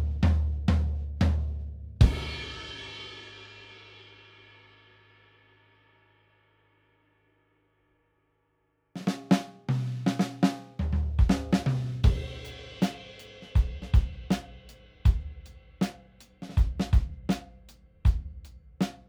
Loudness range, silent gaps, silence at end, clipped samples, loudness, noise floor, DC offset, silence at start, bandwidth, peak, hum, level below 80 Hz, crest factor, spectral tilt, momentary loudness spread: 14 LU; none; 0.1 s; under 0.1%; -29 LUFS; -73 dBFS; under 0.1%; 0 s; 12.5 kHz; -6 dBFS; none; -32 dBFS; 22 dB; -7 dB/octave; 20 LU